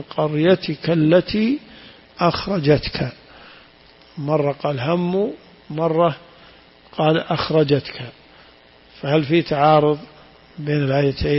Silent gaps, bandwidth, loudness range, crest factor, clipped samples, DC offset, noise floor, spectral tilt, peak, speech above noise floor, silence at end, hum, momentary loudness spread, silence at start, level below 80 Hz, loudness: none; 5.8 kHz; 3 LU; 18 dB; under 0.1%; under 0.1%; -49 dBFS; -10.5 dB/octave; -2 dBFS; 31 dB; 0 s; none; 15 LU; 0 s; -44 dBFS; -19 LUFS